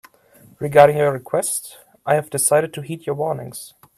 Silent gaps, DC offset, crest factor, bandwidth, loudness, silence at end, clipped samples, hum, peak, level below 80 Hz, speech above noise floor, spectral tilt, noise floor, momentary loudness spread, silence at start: none; under 0.1%; 20 dB; 16 kHz; -19 LUFS; 0.3 s; under 0.1%; none; 0 dBFS; -60 dBFS; 32 dB; -4 dB/octave; -51 dBFS; 19 LU; 0.6 s